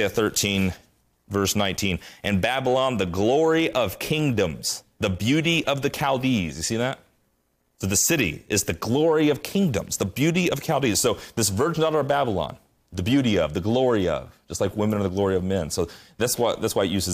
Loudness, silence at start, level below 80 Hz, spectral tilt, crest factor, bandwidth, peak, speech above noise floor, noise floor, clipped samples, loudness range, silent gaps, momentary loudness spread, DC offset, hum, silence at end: -23 LUFS; 0 s; -52 dBFS; -4.5 dB/octave; 14 dB; 15.5 kHz; -10 dBFS; 46 dB; -69 dBFS; under 0.1%; 2 LU; none; 7 LU; under 0.1%; none; 0 s